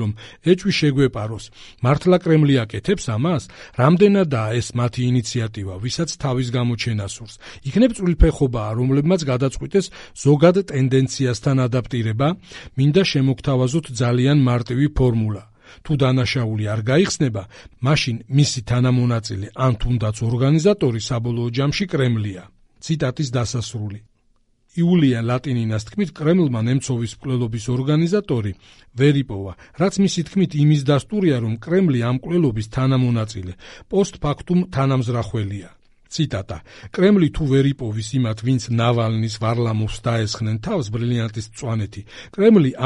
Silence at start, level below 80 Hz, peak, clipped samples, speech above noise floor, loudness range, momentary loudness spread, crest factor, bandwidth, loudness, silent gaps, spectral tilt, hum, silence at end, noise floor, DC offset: 0 s; -36 dBFS; -2 dBFS; under 0.1%; 41 dB; 4 LU; 12 LU; 18 dB; 11 kHz; -20 LUFS; none; -6.5 dB/octave; none; 0 s; -60 dBFS; under 0.1%